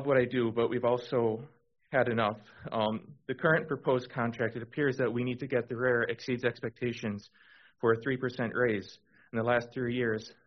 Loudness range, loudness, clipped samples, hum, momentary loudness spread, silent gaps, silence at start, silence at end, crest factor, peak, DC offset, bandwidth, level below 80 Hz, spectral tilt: 2 LU; -31 LUFS; under 0.1%; none; 9 LU; none; 0 s; 0.15 s; 20 dB; -12 dBFS; under 0.1%; 6.4 kHz; -68 dBFS; -5 dB/octave